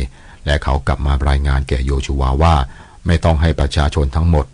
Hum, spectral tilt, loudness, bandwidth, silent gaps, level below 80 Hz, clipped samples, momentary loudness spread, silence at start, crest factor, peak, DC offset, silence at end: none; -6.5 dB/octave; -17 LUFS; 10.5 kHz; none; -18 dBFS; under 0.1%; 6 LU; 0 s; 10 dB; -4 dBFS; under 0.1%; 0.05 s